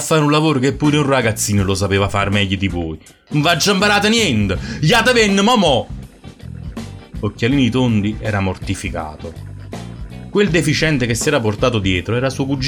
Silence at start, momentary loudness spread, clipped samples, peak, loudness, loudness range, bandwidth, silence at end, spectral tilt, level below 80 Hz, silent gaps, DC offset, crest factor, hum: 0 s; 19 LU; under 0.1%; -2 dBFS; -16 LUFS; 6 LU; 19 kHz; 0 s; -4.5 dB/octave; -36 dBFS; none; under 0.1%; 14 dB; none